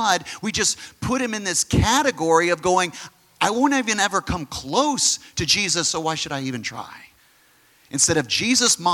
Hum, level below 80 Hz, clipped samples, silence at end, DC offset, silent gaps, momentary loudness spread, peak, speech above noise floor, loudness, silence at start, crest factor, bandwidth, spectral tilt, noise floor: none; -44 dBFS; under 0.1%; 0 s; under 0.1%; none; 10 LU; -2 dBFS; 35 dB; -20 LUFS; 0 s; 20 dB; 17.5 kHz; -2.5 dB/octave; -57 dBFS